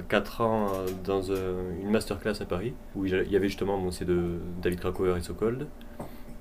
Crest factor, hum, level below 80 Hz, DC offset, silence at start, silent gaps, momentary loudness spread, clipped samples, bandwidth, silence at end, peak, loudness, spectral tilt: 20 dB; none; -44 dBFS; under 0.1%; 0 s; none; 9 LU; under 0.1%; 15.5 kHz; 0 s; -10 dBFS; -30 LUFS; -6.5 dB/octave